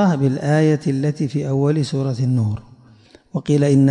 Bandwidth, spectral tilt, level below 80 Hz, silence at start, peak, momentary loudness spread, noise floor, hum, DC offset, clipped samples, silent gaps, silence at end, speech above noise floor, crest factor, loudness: 10 kHz; -8 dB/octave; -54 dBFS; 0 s; -6 dBFS; 8 LU; -48 dBFS; none; under 0.1%; under 0.1%; none; 0 s; 31 dB; 12 dB; -19 LUFS